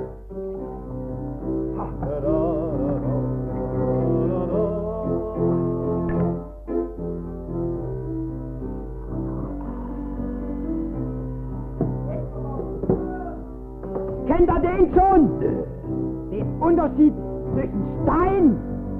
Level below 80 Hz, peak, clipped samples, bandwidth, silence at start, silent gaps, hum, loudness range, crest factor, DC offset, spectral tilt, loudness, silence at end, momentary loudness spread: -34 dBFS; -4 dBFS; under 0.1%; 3.5 kHz; 0 s; none; none; 9 LU; 18 dB; under 0.1%; -12 dB/octave; -24 LUFS; 0 s; 13 LU